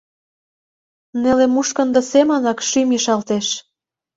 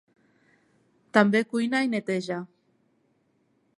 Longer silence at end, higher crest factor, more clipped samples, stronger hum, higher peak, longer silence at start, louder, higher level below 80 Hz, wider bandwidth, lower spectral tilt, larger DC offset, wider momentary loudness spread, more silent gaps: second, 0.55 s vs 1.3 s; second, 16 dB vs 24 dB; neither; neither; about the same, -2 dBFS vs -4 dBFS; about the same, 1.15 s vs 1.15 s; first, -17 LUFS vs -25 LUFS; first, -58 dBFS vs -78 dBFS; second, 7.8 kHz vs 11.5 kHz; second, -3 dB/octave vs -6 dB/octave; neither; second, 7 LU vs 13 LU; neither